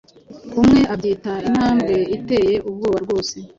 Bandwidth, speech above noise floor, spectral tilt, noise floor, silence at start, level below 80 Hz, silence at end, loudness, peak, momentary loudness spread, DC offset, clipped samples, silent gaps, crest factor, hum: 7.8 kHz; 20 dB; -6 dB/octave; -38 dBFS; 0.3 s; -42 dBFS; 0.1 s; -18 LUFS; -4 dBFS; 9 LU; under 0.1%; under 0.1%; none; 14 dB; none